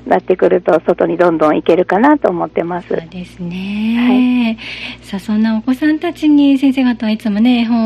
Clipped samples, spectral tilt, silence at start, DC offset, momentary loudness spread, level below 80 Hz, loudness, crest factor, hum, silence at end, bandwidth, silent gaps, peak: under 0.1%; -7 dB/octave; 0.05 s; under 0.1%; 12 LU; -46 dBFS; -13 LUFS; 14 dB; none; 0 s; 12.5 kHz; none; 0 dBFS